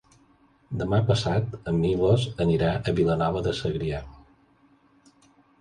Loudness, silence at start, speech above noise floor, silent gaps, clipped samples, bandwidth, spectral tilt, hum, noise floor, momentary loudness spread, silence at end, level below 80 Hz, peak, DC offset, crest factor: -25 LUFS; 0.7 s; 37 dB; none; under 0.1%; 10.5 kHz; -7 dB/octave; none; -60 dBFS; 8 LU; 1.45 s; -44 dBFS; -10 dBFS; under 0.1%; 18 dB